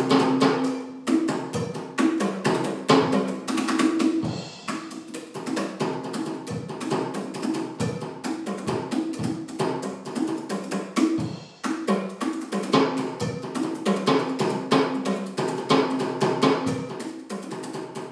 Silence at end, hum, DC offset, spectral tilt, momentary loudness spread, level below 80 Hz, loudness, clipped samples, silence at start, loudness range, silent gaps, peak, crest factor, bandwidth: 0 s; none; under 0.1%; -5.5 dB/octave; 11 LU; -68 dBFS; -26 LUFS; under 0.1%; 0 s; 6 LU; none; -4 dBFS; 20 dB; 11 kHz